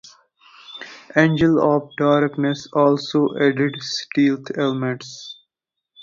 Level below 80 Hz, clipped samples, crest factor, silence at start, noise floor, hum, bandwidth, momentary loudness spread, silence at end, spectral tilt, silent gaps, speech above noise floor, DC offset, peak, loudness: -56 dBFS; under 0.1%; 18 dB; 0.7 s; -82 dBFS; none; 7.4 kHz; 19 LU; 0.7 s; -6 dB/octave; none; 64 dB; under 0.1%; -2 dBFS; -19 LUFS